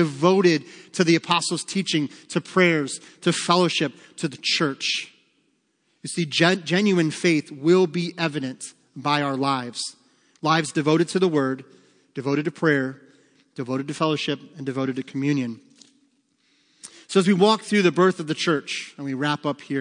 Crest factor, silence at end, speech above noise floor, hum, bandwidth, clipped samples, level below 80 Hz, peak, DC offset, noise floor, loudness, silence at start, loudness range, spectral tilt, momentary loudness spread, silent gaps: 20 dB; 0 s; 46 dB; none; 10.5 kHz; under 0.1%; -76 dBFS; -2 dBFS; under 0.1%; -69 dBFS; -22 LUFS; 0 s; 5 LU; -5 dB/octave; 12 LU; none